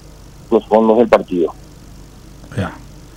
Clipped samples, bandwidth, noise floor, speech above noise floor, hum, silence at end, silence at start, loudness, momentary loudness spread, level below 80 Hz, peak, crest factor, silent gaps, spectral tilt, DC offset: under 0.1%; 15.5 kHz; -38 dBFS; 25 dB; 50 Hz at -40 dBFS; 0.15 s; 0.5 s; -15 LUFS; 15 LU; -42 dBFS; 0 dBFS; 16 dB; none; -7 dB/octave; under 0.1%